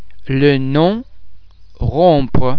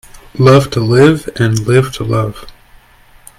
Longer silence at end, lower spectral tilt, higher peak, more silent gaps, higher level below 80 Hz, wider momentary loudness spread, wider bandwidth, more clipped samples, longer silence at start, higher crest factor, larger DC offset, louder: second, 0 s vs 0.9 s; first, -9.5 dB/octave vs -6.5 dB/octave; about the same, 0 dBFS vs 0 dBFS; neither; first, -30 dBFS vs -38 dBFS; about the same, 10 LU vs 8 LU; second, 5.4 kHz vs 15 kHz; second, under 0.1% vs 0.3%; second, 0 s vs 0.15 s; about the same, 14 dB vs 12 dB; neither; second, -15 LUFS vs -11 LUFS